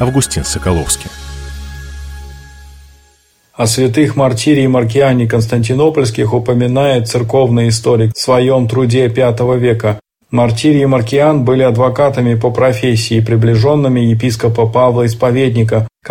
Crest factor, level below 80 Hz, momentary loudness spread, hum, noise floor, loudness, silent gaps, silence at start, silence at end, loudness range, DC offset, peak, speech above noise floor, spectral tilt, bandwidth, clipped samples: 12 dB; -34 dBFS; 7 LU; none; -51 dBFS; -12 LUFS; none; 0 s; 0 s; 6 LU; under 0.1%; 0 dBFS; 41 dB; -6 dB/octave; 16.5 kHz; under 0.1%